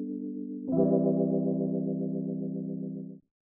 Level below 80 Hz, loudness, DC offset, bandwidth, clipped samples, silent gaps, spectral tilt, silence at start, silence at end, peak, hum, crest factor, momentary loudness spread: -72 dBFS; -30 LUFS; under 0.1%; 1.6 kHz; under 0.1%; none; -14 dB/octave; 0 s; 0.25 s; -14 dBFS; none; 16 dB; 11 LU